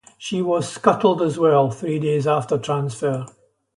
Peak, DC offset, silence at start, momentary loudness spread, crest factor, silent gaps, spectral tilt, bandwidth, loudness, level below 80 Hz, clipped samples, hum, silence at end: -2 dBFS; under 0.1%; 0.2 s; 8 LU; 18 dB; none; -6.5 dB/octave; 11.5 kHz; -20 LUFS; -62 dBFS; under 0.1%; none; 0.5 s